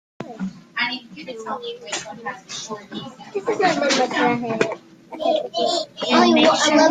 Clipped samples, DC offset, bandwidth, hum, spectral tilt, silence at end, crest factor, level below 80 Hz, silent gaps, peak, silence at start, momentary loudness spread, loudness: under 0.1%; under 0.1%; 9.6 kHz; none; -3 dB/octave; 0 s; 18 dB; -64 dBFS; none; -2 dBFS; 0.2 s; 18 LU; -20 LUFS